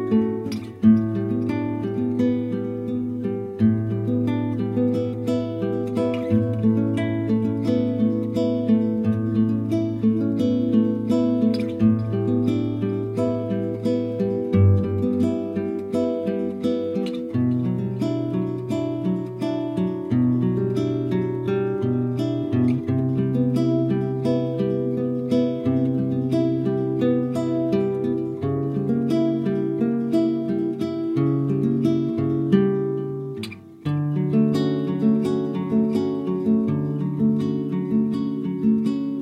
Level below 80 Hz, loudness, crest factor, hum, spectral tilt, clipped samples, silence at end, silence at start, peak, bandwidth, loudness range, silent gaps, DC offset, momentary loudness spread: -56 dBFS; -23 LUFS; 16 dB; none; -9.5 dB/octave; under 0.1%; 0 s; 0 s; -4 dBFS; 9.6 kHz; 2 LU; none; under 0.1%; 5 LU